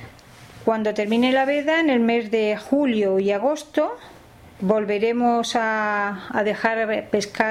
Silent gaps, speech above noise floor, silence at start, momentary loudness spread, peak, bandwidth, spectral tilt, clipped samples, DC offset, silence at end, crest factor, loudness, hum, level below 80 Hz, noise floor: none; 24 dB; 0 s; 6 LU; -4 dBFS; 13 kHz; -5 dB/octave; under 0.1%; under 0.1%; 0 s; 18 dB; -21 LUFS; none; -60 dBFS; -45 dBFS